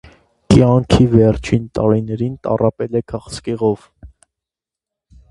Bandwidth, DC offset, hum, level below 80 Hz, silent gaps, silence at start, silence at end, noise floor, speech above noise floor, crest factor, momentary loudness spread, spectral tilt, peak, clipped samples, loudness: 11.5 kHz; under 0.1%; none; -34 dBFS; none; 0.5 s; 1.25 s; -87 dBFS; 71 dB; 16 dB; 12 LU; -7.5 dB/octave; 0 dBFS; under 0.1%; -16 LUFS